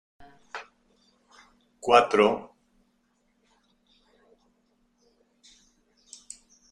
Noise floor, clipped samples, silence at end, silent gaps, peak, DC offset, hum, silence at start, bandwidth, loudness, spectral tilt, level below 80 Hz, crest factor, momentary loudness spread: -70 dBFS; under 0.1%; 4.3 s; none; -6 dBFS; under 0.1%; none; 0.55 s; 11 kHz; -22 LUFS; -4 dB/octave; -66 dBFS; 26 dB; 27 LU